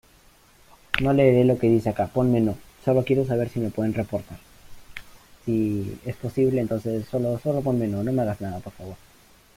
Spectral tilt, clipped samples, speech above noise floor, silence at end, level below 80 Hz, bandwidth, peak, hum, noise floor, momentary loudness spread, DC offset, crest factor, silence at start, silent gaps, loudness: -8 dB/octave; under 0.1%; 32 dB; 0.6 s; -50 dBFS; 16 kHz; -2 dBFS; none; -55 dBFS; 18 LU; under 0.1%; 22 dB; 0.9 s; none; -24 LUFS